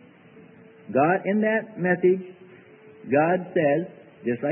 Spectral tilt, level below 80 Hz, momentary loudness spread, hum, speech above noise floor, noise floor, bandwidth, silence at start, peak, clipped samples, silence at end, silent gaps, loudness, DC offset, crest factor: -12 dB/octave; -74 dBFS; 12 LU; none; 27 dB; -50 dBFS; 3.2 kHz; 0.9 s; -8 dBFS; under 0.1%; 0 s; none; -23 LUFS; under 0.1%; 16 dB